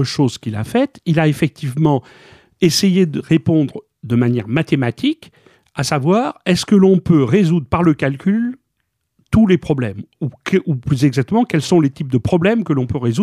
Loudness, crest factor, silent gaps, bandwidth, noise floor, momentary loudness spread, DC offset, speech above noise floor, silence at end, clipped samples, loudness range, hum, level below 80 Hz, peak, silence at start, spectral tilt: -16 LUFS; 14 dB; none; 15 kHz; -71 dBFS; 8 LU; under 0.1%; 56 dB; 0 s; under 0.1%; 3 LU; none; -44 dBFS; -2 dBFS; 0 s; -6.5 dB/octave